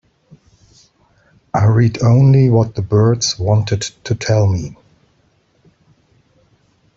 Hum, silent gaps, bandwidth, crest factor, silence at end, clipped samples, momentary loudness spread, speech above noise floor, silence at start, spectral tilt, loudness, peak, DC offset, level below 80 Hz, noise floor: none; none; 8 kHz; 14 dB; 2.25 s; under 0.1%; 12 LU; 45 dB; 1.55 s; -6 dB/octave; -14 LUFS; -2 dBFS; under 0.1%; -46 dBFS; -58 dBFS